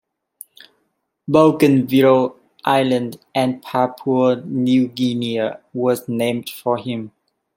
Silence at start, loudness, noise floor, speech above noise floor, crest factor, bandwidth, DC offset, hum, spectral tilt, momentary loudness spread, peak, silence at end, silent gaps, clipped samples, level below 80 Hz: 1.3 s; -18 LUFS; -70 dBFS; 53 dB; 16 dB; 16.5 kHz; under 0.1%; none; -6.5 dB/octave; 11 LU; -2 dBFS; 0.5 s; none; under 0.1%; -62 dBFS